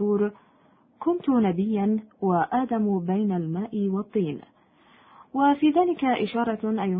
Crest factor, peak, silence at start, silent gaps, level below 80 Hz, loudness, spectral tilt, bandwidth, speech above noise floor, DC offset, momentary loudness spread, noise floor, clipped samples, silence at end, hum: 16 dB; -10 dBFS; 0 s; none; -64 dBFS; -25 LUFS; -12 dB/octave; 4.7 kHz; 36 dB; under 0.1%; 7 LU; -59 dBFS; under 0.1%; 0 s; none